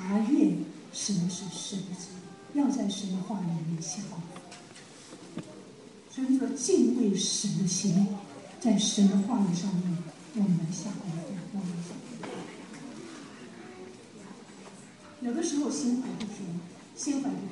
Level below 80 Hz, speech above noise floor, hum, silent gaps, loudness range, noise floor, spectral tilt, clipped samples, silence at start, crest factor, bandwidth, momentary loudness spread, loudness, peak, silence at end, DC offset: -76 dBFS; 21 dB; none; none; 13 LU; -50 dBFS; -5 dB/octave; under 0.1%; 0 s; 18 dB; 11.5 kHz; 22 LU; -30 LUFS; -12 dBFS; 0 s; under 0.1%